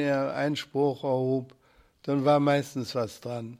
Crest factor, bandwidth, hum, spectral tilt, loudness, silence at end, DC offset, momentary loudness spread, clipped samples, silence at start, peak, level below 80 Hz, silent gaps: 18 dB; 15.5 kHz; none; -6.5 dB/octave; -27 LUFS; 0.05 s; under 0.1%; 10 LU; under 0.1%; 0 s; -10 dBFS; -68 dBFS; none